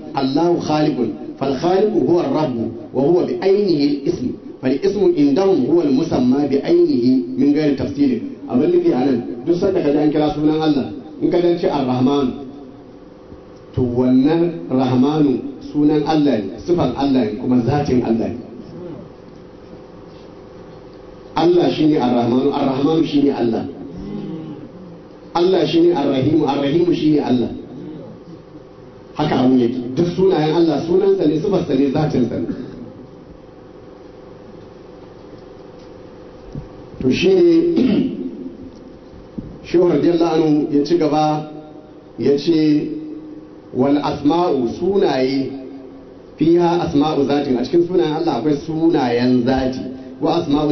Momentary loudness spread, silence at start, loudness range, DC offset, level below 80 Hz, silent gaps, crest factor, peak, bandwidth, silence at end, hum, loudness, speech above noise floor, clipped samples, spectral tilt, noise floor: 18 LU; 0 s; 4 LU; under 0.1%; -48 dBFS; none; 12 dB; -4 dBFS; 6.4 kHz; 0 s; none; -17 LUFS; 24 dB; under 0.1%; -7.5 dB/octave; -39 dBFS